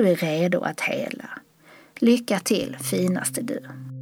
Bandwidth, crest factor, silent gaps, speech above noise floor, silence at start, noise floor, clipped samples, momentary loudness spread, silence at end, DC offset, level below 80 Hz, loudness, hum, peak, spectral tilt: over 20 kHz; 18 dB; none; 29 dB; 0 s; -52 dBFS; under 0.1%; 15 LU; 0 s; under 0.1%; -68 dBFS; -24 LUFS; none; -6 dBFS; -5 dB/octave